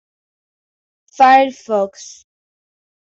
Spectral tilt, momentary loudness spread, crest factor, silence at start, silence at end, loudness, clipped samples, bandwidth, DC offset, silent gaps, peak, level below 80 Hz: -3.5 dB/octave; 14 LU; 16 dB; 1.2 s; 1.1 s; -14 LUFS; under 0.1%; 7.6 kHz; under 0.1%; none; -2 dBFS; -68 dBFS